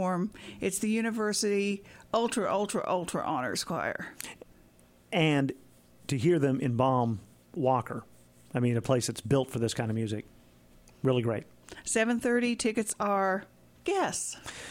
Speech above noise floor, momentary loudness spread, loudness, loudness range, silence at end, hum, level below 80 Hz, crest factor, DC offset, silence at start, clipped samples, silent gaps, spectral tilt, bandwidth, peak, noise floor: 30 dB; 12 LU; -30 LUFS; 3 LU; 0 s; none; -62 dBFS; 18 dB; under 0.1%; 0 s; under 0.1%; none; -5 dB/octave; 16.5 kHz; -12 dBFS; -60 dBFS